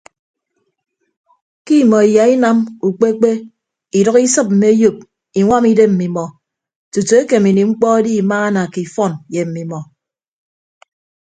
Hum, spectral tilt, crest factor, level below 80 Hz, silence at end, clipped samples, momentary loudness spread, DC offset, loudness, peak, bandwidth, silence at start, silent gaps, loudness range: none; -6 dB/octave; 14 dB; -56 dBFS; 1.4 s; under 0.1%; 12 LU; under 0.1%; -13 LUFS; 0 dBFS; 9.4 kHz; 1.65 s; 6.76-6.92 s; 3 LU